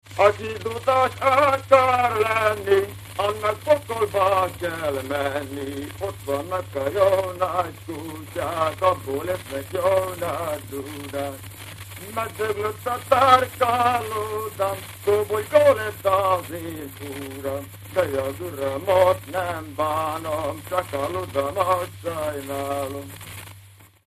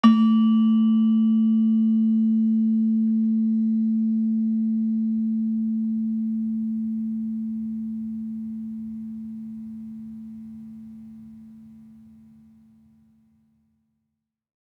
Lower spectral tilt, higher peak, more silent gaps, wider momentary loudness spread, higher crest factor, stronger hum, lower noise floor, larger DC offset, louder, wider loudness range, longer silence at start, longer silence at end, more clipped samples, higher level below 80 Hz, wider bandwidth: second, -4.5 dB/octave vs -9 dB/octave; first, 0 dBFS vs -4 dBFS; neither; second, 14 LU vs 19 LU; about the same, 22 dB vs 18 dB; neither; second, -49 dBFS vs -80 dBFS; neither; about the same, -23 LUFS vs -23 LUFS; second, 6 LU vs 20 LU; about the same, 0.05 s vs 0.05 s; second, 0.2 s vs 2.7 s; neither; first, -54 dBFS vs -70 dBFS; first, 15.5 kHz vs 5.6 kHz